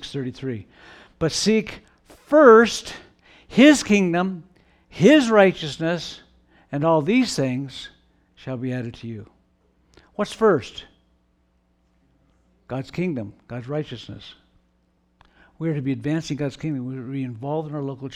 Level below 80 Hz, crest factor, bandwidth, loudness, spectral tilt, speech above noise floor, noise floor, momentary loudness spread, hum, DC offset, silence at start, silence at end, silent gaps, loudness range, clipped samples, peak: -56 dBFS; 20 dB; 13 kHz; -20 LUFS; -5.5 dB/octave; 44 dB; -65 dBFS; 23 LU; none; under 0.1%; 0 s; 0 s; none; 15 LU; under 0.1%; -2 dBFS